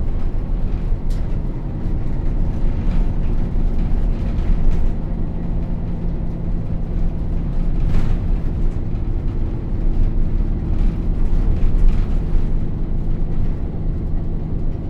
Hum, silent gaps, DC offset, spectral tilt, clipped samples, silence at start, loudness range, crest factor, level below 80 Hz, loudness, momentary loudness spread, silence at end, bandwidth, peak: none; none; under 0.1%; -9.5 dB/octave; under 0.1%; 0 s; 2 LU; 14 dB; -18 dBFS; -24 LUFS; 4 LU; 0 s; 3.3 kHz; -2 dBFS